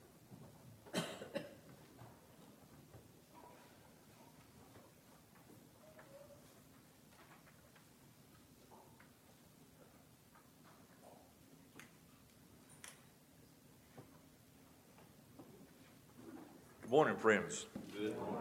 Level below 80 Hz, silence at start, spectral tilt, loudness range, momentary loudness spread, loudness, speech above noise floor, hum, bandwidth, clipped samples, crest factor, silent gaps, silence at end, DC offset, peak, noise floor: -80 dBFS; 0.3 s; -4.5 dB/octave; 23 LU; 21 LU; -40 LUFS; 29 dB; none; 17 kHz; under 0.1%; 30 dB; none; 0 s; under 0.1%; -18 dBFS; -66 dBFS